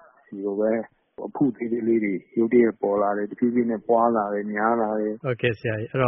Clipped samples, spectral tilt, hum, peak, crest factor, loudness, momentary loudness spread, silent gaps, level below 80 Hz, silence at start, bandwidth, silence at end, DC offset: under 0.1%; -3.5 dB/octave; none; -6 dBFS; 18 dB; -24 LUFS; 9 LU; none; -64 dBFS; 0.3 s; 3.8 kHz; 0 s; under 0.1%